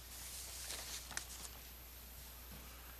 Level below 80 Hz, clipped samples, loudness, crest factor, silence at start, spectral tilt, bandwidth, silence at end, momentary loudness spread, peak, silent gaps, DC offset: -58 dBFS; under 0.1%; -48 LUFS; 30 dB; 0 s; -1 dB/octave; 15 kHz; 0 s; 8 LU; -20 dBFS; none; under 0.1%